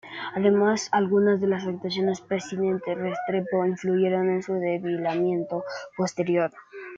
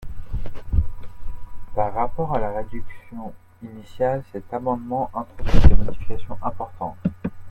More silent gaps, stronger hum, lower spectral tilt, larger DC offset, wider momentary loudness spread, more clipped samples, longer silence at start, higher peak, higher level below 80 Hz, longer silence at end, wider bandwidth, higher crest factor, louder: neither; neither; second, -6 dB/octave vs -8.5 dB/octave; neither; second, 8 LU vs 19 LU; second, under 0.1% vs 0.1%; about the same, 0.05 s vs 0 s; second, -8 dBFS vs 0 dBFS; second, -70 dBFS vs -26 dBFS; about the same, 0 s vs 0 s; first, 7.8 kHz vs 5.2 kHz; about the same, 16 dB vs 18 dB; about the same, -25 LUFS vs -26 LUFS